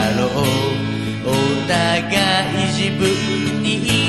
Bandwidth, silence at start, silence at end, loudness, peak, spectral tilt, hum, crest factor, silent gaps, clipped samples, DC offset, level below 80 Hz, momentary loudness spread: 13.5 kHz; 0 s; 0 s; -18 LUFS; -2 dBFS; -4.5 dB/octave; none; 16 dB; none; under 0.1%; 0.3%; -42 dBFS; 4 LU